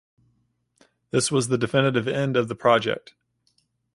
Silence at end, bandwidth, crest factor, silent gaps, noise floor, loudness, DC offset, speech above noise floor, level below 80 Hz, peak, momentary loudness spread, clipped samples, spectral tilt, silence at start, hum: 0.95 s; 11.5 kHz; 20 dB; none; -69 dBFS; -23 LUFS; under 0.1%; 47 dB; -62 dBFS; -6 dBFS; 7 LU; under 0.1%; -4.5 dB/octave; 1.15 s; none